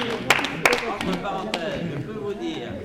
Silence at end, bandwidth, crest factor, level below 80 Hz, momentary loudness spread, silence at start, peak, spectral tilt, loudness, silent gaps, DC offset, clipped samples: 0 s; 16 kHz; 20 dB; -48 dBFS; 10 LU; 0 s; -6 dBFS; -3.5 dB/octave; -24 LUFS; none; under 0.1%; under 0.1%